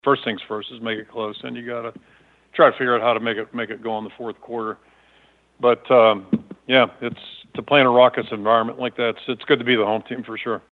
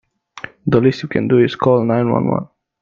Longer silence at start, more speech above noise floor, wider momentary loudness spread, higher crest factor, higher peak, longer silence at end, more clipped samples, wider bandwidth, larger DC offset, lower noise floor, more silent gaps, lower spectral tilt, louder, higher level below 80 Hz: second, 0.05 s vs 0.35 s; first, 37 dB vs 21 dB; about the same, 16 LU vs 17 LU; about the same, 20 dB vs 16 dB; about the same, 0 dBFS vs 0 dBFS; second, 0.15 s vs 0.35 s; neither; second, 4.5 kHz vs 7.2 kHz; neither; first, -57 dBFS vs -36 dBFS; neither; about the same, -7.5 dB/octave vs -8.5 dB/octave; second, -20 LUFS vs -16 LUFS; second, -68 dBFS vs -52 dBFS